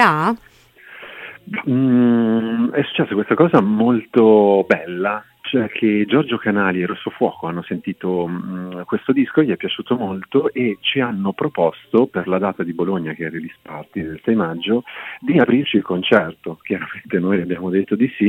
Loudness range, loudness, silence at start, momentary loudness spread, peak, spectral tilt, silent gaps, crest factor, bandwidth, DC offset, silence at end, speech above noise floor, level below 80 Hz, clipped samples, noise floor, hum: 5 LU; -18 LUFS; 0 s; 13 LU; 0 dBFS; -8 dB/octave; none; 18 dB; 8.2 kHz; under 0.1%; 0 s; 26 dB; -60 dBFS; under 0.1%; -44 dBFS; none